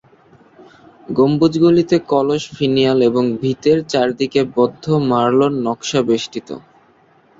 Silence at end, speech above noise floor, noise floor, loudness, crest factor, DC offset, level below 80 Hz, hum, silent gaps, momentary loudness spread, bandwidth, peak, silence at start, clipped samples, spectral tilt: 0.8 s; 37 dB; -52 dBFS; -16 LUFS; 16 dB; under 0.1%; -54 dBFS; none; none; 7 LU; 7.8 kHz; -2 dBFS; 1.1 s; under 0.1%; -6 dB/octave